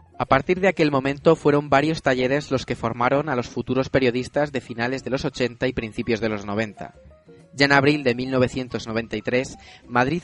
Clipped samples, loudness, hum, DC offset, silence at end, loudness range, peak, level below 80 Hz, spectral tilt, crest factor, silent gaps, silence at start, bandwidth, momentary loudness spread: under 0.1%; -22 LUFS; none; under 0.1%; 0 s; 4 LU; -2 dBFS; -48 dBFS; -6 dB/octave; 22 dB; none; 0.2 s; 11 kHz; 9 LU